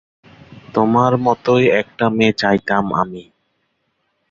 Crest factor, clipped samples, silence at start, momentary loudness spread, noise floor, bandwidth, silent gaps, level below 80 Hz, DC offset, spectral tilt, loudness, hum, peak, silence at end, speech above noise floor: 18 dB; under 0.1%; 0.5 s; 8 LU; -68 dBFS; 7.6 kHz; none; -52 dBFS; under 0.1%; -6.5 dB/octave; -16 LUFS; none; 0 dBFS; 1.1 s; 53 dB